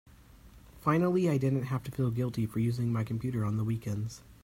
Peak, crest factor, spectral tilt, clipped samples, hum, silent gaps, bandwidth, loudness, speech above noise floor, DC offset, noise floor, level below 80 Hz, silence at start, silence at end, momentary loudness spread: -14 dBFS; 18 dB; -8 dB/octave; under 0.1%; none; none; 16 kHz; -31 LUFS; 24 dB; under 0.1%; -55 dBFS; -58 dBFS; 0.45 s; 0.1 s; 8 LU